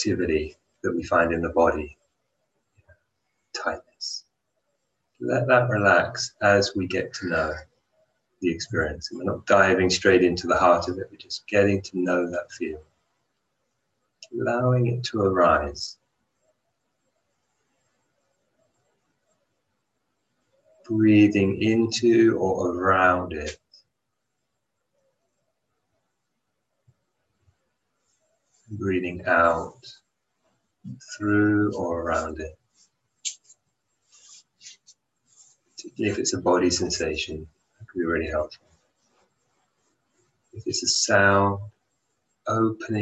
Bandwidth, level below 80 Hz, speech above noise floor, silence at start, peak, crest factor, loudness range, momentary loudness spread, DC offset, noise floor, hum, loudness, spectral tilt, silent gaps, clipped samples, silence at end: 8.8 kHz; -50 dBFS; 57 dB; 0 s; -4 dBFS; 22 dB; 12 LU; 16 LU; under 0.1%; -80 dBFS; none; -23 LUFS; -4.5 dB/octave; none; under 0.1%; 0 s